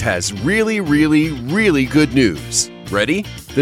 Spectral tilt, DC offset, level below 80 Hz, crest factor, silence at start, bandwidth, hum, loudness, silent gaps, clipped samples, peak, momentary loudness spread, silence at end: -4.5 dB/octave; under 0.1%; -38 dBFS; 14 dB; 0 s; 15.5 kHz; none; -16 LUFS; none; under 0.1%; -2 dBFS; 5 LU; 0 s